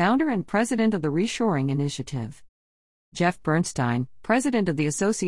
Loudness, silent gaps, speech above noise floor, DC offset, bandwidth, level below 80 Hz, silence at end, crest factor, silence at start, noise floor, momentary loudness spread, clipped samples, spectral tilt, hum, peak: -25 LUFS; 2.49-3.12 s; over 66 dB; 0.4%; 12 kHz; -56 dBFS; 0 s; 18 dB; 0 s; under -90 dBFS; 8 LU; under 0.1%; -5.5 dB/octave; none; -6 dBFS